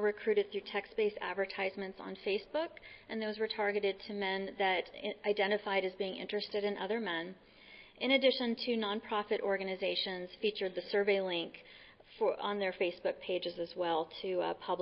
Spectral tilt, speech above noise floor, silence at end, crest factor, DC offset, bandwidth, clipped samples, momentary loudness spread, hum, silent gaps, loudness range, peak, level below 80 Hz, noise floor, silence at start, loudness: -1.5 dB/octave; 22 dB; 0 s; 20 dB; under 0.1%; 5.6 kHz; under 0.1%; 9 LU; none; none; 3 LU; -16 dBFS; -72 dBFS; -57 dBFS; 0 s; -35 LUFS